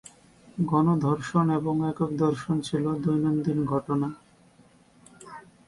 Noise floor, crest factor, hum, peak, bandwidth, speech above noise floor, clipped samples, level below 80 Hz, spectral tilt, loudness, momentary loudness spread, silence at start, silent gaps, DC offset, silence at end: -58 dBFS; 16 dB; none; -10 dBFS; 11.5 kHz; 33 dB; under 0.1%; -60 dBFS; -8 dB/octave; -26 LUFS; 10 LU; 0.55 s; none; under 0.1%; 0.3 s